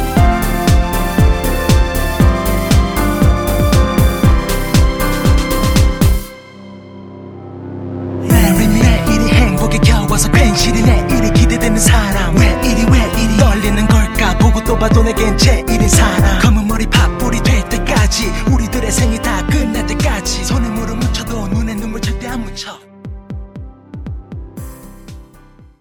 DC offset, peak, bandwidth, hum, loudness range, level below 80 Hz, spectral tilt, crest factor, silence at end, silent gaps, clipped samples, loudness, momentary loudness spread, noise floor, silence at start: under 0.1%; 0 dBFS; over 20 kHz; none; 9 LU; -16 dBFS; -5 dB/octave; 12 dB; 0.55 s; none; under 0.1%; -13 LUFS; 18 LU; -42 dBFS; 0 s